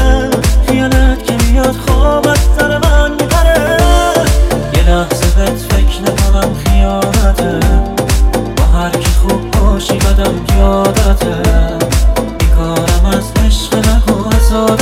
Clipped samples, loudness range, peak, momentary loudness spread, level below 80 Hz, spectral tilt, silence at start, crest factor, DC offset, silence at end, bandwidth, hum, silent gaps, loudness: 0.4%; 2 LU; 0 dBFS; 3 LU; -12 dBFS; -5.5 dB/octave; 0 s; 10 dB; under 0.1%; 0 s; 16 kHz; none; none; -11 LUFS